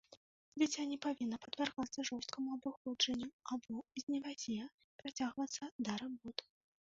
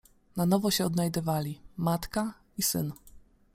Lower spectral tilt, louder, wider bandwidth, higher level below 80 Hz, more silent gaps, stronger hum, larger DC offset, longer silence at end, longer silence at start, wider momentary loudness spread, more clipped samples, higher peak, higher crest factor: second, -2 dB/octave vs -5 dB/octave; second, -42 LUFS vs -30 LUFS; second, 7.6 kHz vs 16.5 kHz; second, -78 dBFS vs -54 dBFS; first, 0.17-0.52 s, 2.77-2.85 s, 3.33-3.39 s, 4.03-4.07 s, 4.74-4.78 s, 4.84-4.99 s, 5.72-5.79 s vs none; neither; neither; first, 0.5 s vs 0.35 s; second, 0.1 s vs 0.35 s; about the same, 10 LU vs 12 LU; neither; second, -20 dBFS vs -12 dBFS; about the same, 22 dB vs 20 dB